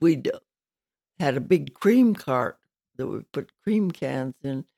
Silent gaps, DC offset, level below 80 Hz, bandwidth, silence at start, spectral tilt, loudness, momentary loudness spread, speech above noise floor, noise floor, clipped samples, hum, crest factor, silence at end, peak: none; under 0.1%; -68 dBFS; 14.5 kHz; 0 s; -7.5 dB/octave; -25 LUFS; 13 LU; over 66 dB; under -90 dBFS; under 0.1%; none; 16 dB; 0.15 s; -8 dBFS